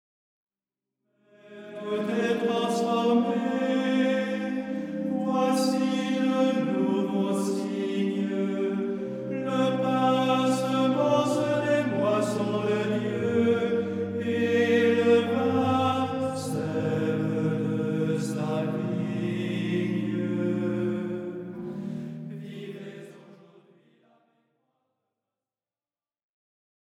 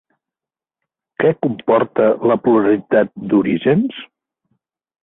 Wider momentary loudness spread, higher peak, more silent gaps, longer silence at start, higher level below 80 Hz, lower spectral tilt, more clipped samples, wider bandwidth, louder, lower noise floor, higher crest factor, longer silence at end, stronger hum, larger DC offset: first, 10 LU vs 6 LU; second, -10 dBFS vs -2 dBFS; neither; first, 1.45 s vs 1.2 s; second, -70 dBFS vs -58 dBFS; second, -6.5 dB/octave vs -12 dB/octave; neither; first, 14.5 kHz vs 4 kHz; second, -26 LUFS vs -16 LUFS; about the same, under -90 dBFS vs -89 dBFS; about the same, 16 dB vs 14 dB; first, 3.65 s vs 1 s; neither; neither